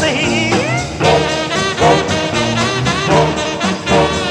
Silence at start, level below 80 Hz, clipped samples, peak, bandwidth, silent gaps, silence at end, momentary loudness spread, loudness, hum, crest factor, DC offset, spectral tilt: 0 s; -36 dBFS; under 0.1%; 0 dBFS; 12.5 kHz; none; 0 s; 4 LU; -14 LUFS; none; 14 dB; under 0.1%; -4.5 dB/octave